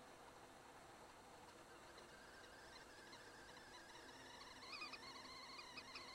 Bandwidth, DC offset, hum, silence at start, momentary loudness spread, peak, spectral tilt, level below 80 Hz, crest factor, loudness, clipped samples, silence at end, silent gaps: 16 kHz; under 0.1%; none; 0 s; 9 LU; -40 dBFS; -2 dB/octave; -78 dBFS; 18 dB; -58 LUFS; under 0.1%; 0 s; none